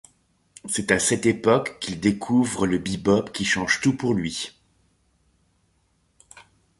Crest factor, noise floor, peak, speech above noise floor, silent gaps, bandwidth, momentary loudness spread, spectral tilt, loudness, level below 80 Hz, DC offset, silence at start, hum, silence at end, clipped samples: 22 dB; -66 dBFS; -2 dBFS; 44 dB; none; 11.5 kHz; 9 LU; -4 dB/octave; -23 LUFS; -52 dBFS; under 0.1%; 0.65 s; none; 0.4 s; under 0.1%